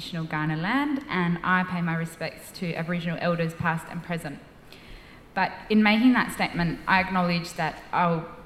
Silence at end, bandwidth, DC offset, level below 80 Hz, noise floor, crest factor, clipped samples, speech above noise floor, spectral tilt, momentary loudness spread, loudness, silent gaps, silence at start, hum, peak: 0 s; 14 kHz; under 0.1%; -52 dBFS; -46 dBFS; 20 dB; under 0.1%; 20 dB; -6 dB/octave; 12 LU; -26 LUFS; none; 0 s; none; -6 dBFS